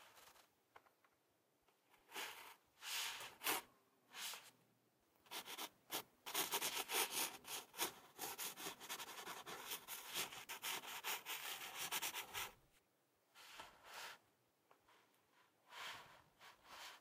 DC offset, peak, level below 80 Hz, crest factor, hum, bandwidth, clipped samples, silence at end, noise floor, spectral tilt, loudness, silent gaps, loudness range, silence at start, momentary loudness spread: under 0.1%; -26 dBFS; -88 dBFS; 24 dB; none; 16 kHz; under 0.1%; 0 s; -81 dBFS; 0.5 dB/octave; -47 LUFS; none; 14 LU; 0 s; 18 LU